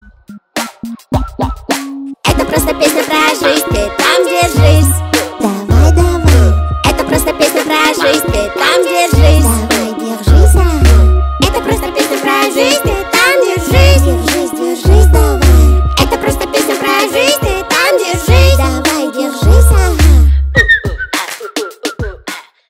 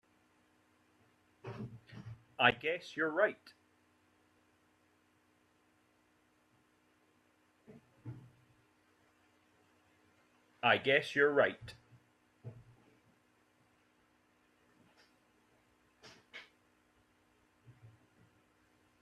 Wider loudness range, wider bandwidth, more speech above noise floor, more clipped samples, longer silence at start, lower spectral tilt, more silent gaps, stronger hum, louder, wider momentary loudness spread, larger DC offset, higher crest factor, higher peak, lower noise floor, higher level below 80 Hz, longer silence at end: second, 1 LU vs 7 LU; first, 16 kHz vs 12.5 kHz; second, 26 dB vs 40 dB; first, 0.5% vs under 0.1%; second, 0.3 s vs 1.45 s; about the same, -5 dB/octave vs -5 dB/octave; neither; neither; first, -10 LUFS vs -32 LUFS; second, 10 LU vs 25 LU; neither; second, 10 dB vs 30 dB; first, 0 dBFS vs -12 dBFS; second, -35 dBFS vs -73 dBFS; first, -14 dBFS vs -78 dBFS; second, 0.3 s vs 1.15 s